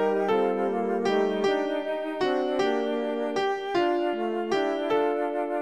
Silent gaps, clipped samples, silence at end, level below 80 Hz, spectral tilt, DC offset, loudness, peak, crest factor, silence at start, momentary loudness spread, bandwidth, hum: none; under 0.1%; 0 s; -70 dBFS; -5.5 dB/octave; 0.2%; -26 LUFS; -12 dBFS; 14 dB; 0 s; 4 LU; 9.8 kHz; none